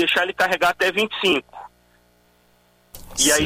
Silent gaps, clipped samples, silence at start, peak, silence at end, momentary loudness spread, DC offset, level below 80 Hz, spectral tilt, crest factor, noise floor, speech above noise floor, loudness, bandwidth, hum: none; under 0.1%; 0 s; -6 dBFS; 0 s; 15 LU; under 0.1%; -50 dBFS; -1.5 dB/octave; 16 dB; -59 dBFS; 39 dB; -20 LUFS; 16 kHz; 60 Hz at -60 dBFS